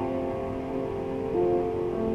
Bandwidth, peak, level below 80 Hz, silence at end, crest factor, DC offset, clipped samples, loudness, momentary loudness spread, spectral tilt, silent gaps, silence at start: 7.6 kHz; -16 dBFS; -46 dBFS; 0 s; 14 dB; under 0.1%; under 0.1%; -29 LUFS; 6 LU; -9 dB/octave; none; 0 s